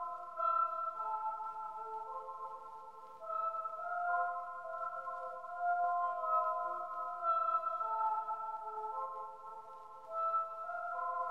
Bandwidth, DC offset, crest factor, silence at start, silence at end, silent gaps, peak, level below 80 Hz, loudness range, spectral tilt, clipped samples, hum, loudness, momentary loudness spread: 9.6 kHz; under 0.1%; 16 dB; 0 s; 0 s; none; -22 dBFS; -86 dBFS; 5 LU; -3.5 dB/octave; under 0.1%; none; -38 LUFS; 13 LU